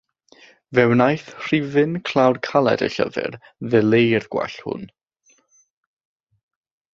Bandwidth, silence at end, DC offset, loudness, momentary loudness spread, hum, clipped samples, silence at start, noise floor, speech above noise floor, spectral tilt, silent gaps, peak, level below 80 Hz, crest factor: 7.6 kHz; 2.05 s; under 0.1%; -19 LUFS; 13 LU; none; under 0.1%; 0.7 s; -61 dBFS; 42 dB; -7 dB/octave; none; -2 dBFS; -60 dBFS; 20 dB